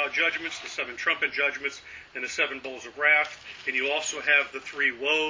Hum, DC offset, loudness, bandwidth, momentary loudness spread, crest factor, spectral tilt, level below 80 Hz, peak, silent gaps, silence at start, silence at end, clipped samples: none; under 0.1%; -25 LUFS; 7.6 kHz; 12 LU; 20 dB; -0.5 dB/octave; -66 dBFS; -6 dBFS; none; 0 s; 0 s; under 0.1%